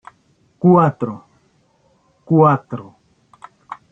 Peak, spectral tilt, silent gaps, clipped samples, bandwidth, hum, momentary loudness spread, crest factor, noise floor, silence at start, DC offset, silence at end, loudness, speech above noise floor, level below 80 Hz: -2 dBFS; -11 dB/octave; none; under 0.1%; 3.8 kHz; none; 24 LU; 18 dB; -59 dBFS; 0.65 s; under 0.1%; 0.15 s; -15 LUFS; 44 dB; -60 dBFS